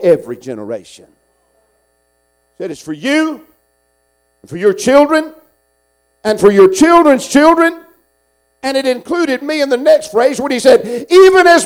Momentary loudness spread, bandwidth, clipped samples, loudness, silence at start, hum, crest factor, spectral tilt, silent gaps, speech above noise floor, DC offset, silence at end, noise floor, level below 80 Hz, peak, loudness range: 18 LU; 16.5 kHz; under 0.1%; -11 LUFS; 0 s; 60 Hz at -55 dBFS; 12 dB; -4 dB/octave; none; 50 dB; under 0.1%; 0 s; -60 dBFS; -50 dBFS; 0 dBFS; 12 LU